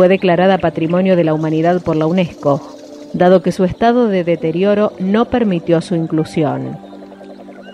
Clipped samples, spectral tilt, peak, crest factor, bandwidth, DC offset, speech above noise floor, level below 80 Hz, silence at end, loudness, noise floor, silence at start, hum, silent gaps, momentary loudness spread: under 0.1%; -8 dB/octave; 0 dBFS; 14 dB; 11 kHz; under 0.1%; 21 dB; -46 dBFS; 0 s; -14 LUFS; -34 dBFS; 0 s; none; none; 21 LU